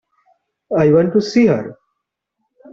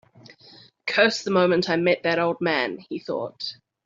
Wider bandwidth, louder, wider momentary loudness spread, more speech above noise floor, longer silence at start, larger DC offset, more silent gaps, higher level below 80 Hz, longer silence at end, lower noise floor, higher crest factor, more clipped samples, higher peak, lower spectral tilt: about the same, 7.6 kHz vs 7.6 kHz; first, -15 LUFS vs -23 LUFS; second, 9 LU vs 13 LU; first, 63 dB vs 29 dB; second, 0.7 s vs 0.85 s; neither; neither; first, -56 dBFS vs -68 dBFS; first, 1 s vs 0.35 s; first, -76 dBFS vs -51 dBFS; second, 14 dB vs 22 dB; neither; about the same, -2 dBFS vs -4 dBFS; first, -7.5 dB/octave vs -5 dB/octave